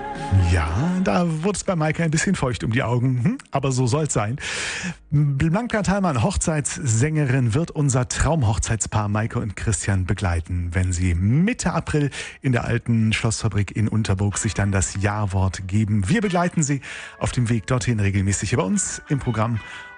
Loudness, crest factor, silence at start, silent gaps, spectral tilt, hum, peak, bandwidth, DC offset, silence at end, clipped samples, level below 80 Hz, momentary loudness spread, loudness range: -22 LUFS; 14 dB; 0 s; none; -5.5 dB/octave; none; -6 dBFS; 10 kHz; under 0.1%; 0 s; under 0.1%; -38 dBFS; 5 LU; 1 LU